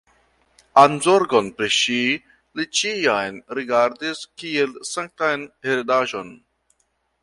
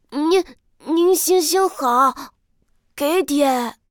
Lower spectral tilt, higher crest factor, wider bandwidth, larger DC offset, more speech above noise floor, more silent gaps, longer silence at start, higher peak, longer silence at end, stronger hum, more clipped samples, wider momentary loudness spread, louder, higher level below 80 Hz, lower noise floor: first, -3 dB/octave vs -1.5 dB/octave; first, 22 dB vs 14 dB; second, 11.5 kHz vs over 20 kHz; neither; first, 49 dB vs 44 dB; neither; first, 0.75 s vs 0.1 s; first, 0 dBFS vs -6 dBFS; first, 0.85 s vs 0.2 s; neither; neither; first, 14 LU vs 9 LU; about the same, -20 LUFS vs -18 LUFS; second, -64 dBFS vs -58 dBFS; first, -69 dBFS vs -62 dBFS